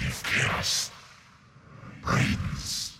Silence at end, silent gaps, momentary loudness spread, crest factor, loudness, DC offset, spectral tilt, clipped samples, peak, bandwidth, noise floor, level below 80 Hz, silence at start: 0 s; none; 22 LU; 18 dB; -27 LUFS; under 0.1%; -3 dB/octave; under 0.1%; -12 dBFS; 16.5 kHz; -54 dBFS; -46 dBFS; 0 s